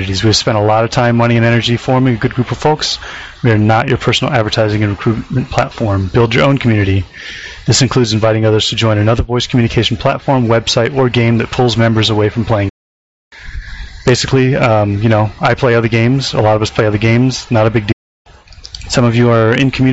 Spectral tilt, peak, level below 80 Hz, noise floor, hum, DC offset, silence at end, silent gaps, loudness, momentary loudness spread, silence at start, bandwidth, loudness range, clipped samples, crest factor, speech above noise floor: -5 dB/octave; 0 dBFS; -34 dBFS; -33 dBFS; none; under 0.1%; 0 s; 12.70-13.31 s, 17.93-18.25 s; -12 LUFS; 7 LU; 0 s; 8 kHz; 2 LU; under 0.1%; 12 dB; 22 dB